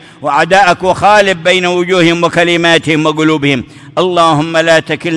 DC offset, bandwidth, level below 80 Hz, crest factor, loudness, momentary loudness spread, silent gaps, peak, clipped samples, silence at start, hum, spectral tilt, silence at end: under 0.1%; 12 kHz; -46 dBFS; 10 dB; -9 LUFS; 5 LU; none; 0 dBFS; under 0.1%; 0.2 s; none; -4.5 dB/octave; 0 s